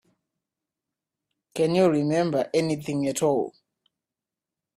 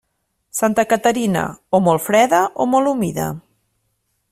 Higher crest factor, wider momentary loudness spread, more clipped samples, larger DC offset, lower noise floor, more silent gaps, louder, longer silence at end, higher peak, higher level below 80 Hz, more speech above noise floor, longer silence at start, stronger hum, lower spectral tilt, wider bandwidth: about the same, 18 dB vs 16 dB; second, 7 LU vs 10 LU; neither; neither; first, -89 dBFS vs -71 dBFS; neither; second, -24 LUFS vs -17 LUFS; first, 1.25 s vs 0.95 s; second, -10 dBFS vs -2 dBFS; second, -66 dBFS vs -54 dBFS; first, 66 dB vs 54 dB; first, 1.55 s vs 0.55 s; neither; about the same, -6 dB/octave vs -5 dB/octave; about the same, 15 kHz vs 16 kHz